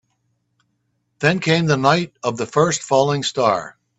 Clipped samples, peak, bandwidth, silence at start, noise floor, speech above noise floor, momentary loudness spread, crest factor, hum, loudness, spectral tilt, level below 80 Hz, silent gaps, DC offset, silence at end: under 0.1%; 0 dBFS; 8.4 kHz; 1.2 s; -70 dBFS; 52 dB; 6 LU; 20 dB; none; -18 LUFS; -4.5 dB/octave; -58 dBFS; none; under 0.1%; 0.3 s